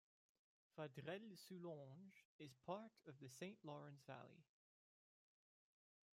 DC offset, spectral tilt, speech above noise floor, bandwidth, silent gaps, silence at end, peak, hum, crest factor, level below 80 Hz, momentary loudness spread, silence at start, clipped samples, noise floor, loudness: under 0.1%; -5.5 dB/octave; over 33 dB; 15 kHz; 2.25-2.39 s; 1.75 s; -36 dBFS; none; 22 dB; under -90 dBFS; 10 LU; 0.75 s; under 0.1%; under -90 dBFS; -58 LUFS